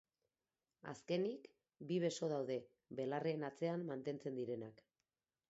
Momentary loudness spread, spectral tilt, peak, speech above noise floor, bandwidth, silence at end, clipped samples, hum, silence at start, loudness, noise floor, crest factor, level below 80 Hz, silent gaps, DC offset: 14 LU; -6 dB/octave; -28 dBFS; over 47 dB; 7.6 kHz; 0.75 s; under 0.1%; none; 0.85 s; -43 LUFS; under -90 dBFS; 18 dB; -88 dBFS; none; under 0.1%